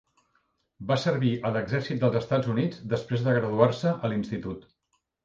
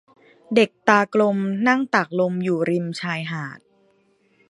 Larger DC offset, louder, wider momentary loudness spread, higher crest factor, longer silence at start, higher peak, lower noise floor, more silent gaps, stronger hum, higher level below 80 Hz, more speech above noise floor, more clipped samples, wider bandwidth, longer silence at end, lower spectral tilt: neither; second, -27 LUFS vs -21 LUFS; about the same, 10 LU vs 10 LU; about the same, 22 dB vs 22 dB; first, 0.8 s vs 0.5 s; second, -6 dBFS vs 0 dBFS; first, -76 dBFS vs -62 dBFS; neither; neither; first, -60 dBFS vs -70 dBFS; first, 50 dB vs 41 dB; neither; second, 7.6 kHz vs 11.5 kHz; second, 0.65 s vs 0.9 s; first, -7.5 dB/octave vs -6 dB/octave